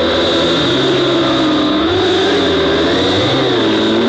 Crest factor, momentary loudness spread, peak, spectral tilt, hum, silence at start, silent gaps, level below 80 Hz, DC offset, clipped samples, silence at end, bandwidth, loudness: 8 dB; 1 LU; -4 dBFS; -5 dB/octave; none; 0 s; none; -38 dBFS; under 0.1%; under 0.1%; 0 s; 9 kHz; -12 LUFS